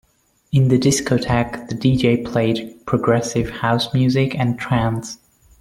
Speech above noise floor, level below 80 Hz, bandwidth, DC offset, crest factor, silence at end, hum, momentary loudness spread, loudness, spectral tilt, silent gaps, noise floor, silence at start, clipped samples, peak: 39 dB; -44 dBFS; 14 kHz; under 0.1%; 16 dB; 0.45 s; none; 7 LU; -19 LUFS; -6 dB/octave; none; -57 dBFS; 0.5 s; under 0.1%; -2 dBFS